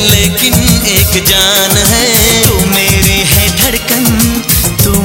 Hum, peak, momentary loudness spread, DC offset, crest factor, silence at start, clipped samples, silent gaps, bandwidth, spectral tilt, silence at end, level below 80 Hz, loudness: none; 0 dBFS; 3 LU; under 0.1%; 8 dB; 0 s; 0.9%; none; over 20 kHz; -3 dB/octave; 0 s; -20 dBFS; -7 LUFS